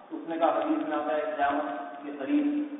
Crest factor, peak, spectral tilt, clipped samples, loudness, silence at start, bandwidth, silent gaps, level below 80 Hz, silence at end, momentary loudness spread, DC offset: 16 dB; -12 dBFS; -8.5 dB/octave; under 0.1%; -29 LUFS; 0 s; 4 kHz; none; -72 dBFS; 0 s; 10 LU; under 0.1%